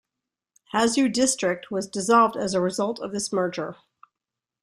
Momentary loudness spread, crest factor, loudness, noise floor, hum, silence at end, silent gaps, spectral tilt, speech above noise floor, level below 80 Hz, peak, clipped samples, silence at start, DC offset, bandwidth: 10 LU; 20 dB; -23 LUFS; -88 dBFS; none; 0.9 s; none; -3.5 dB/octave; 64 dB; -64 dBFS; -6 dBFS; under 0.1%; 0.75 s; under 0.1%; 14 kHz